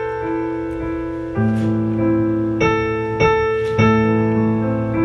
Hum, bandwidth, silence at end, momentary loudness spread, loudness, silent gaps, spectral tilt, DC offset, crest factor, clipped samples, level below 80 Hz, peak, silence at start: none; 6.8 kHz; 0 s; 9 LU; -18 LUFS; none; -8 dB/octave; under 0.1%; 16 dB; under 0.1%; -38 dBFS; -2 dBFS; 0 s